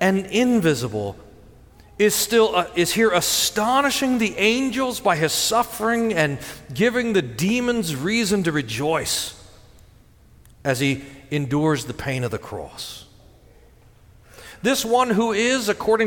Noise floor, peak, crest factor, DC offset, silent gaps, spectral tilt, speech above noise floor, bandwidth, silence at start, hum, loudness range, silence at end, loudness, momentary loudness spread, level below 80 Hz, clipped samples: -51 dBFS; -4 dBFS; 18 dB; under 0.1%; none; -4 dB/octave; 30 dB; 19 kHz; 0 s; none; 7 LU; 0 s; -21 LUFS; 11 LU; -50 dBFS; under 0.1%